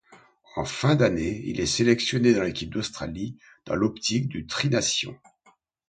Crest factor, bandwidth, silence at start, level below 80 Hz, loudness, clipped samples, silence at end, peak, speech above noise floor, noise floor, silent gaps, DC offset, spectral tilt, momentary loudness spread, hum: 20 dB; 9.4 kHz; 0.1 s; -50 dBFS; -25 LUFS; under 0.1%; 0.75 s; -6 dBFS; 38 dB; -63 dBFS; none; under 0.1%; -4.5 dB/octave; 12 LU; none